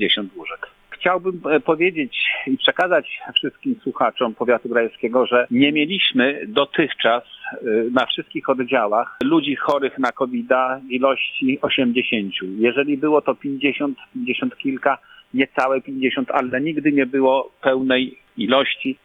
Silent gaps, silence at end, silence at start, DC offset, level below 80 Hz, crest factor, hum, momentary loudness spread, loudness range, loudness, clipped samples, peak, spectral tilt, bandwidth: none; 0.1 s; 0 s; under 0.1%; -64 dBFS; 18 dB; none; 7 LU; 3 LU; -20 LUFS; under 0.1%; -2 dBFS; -6 dB/octave; 7.4 kHz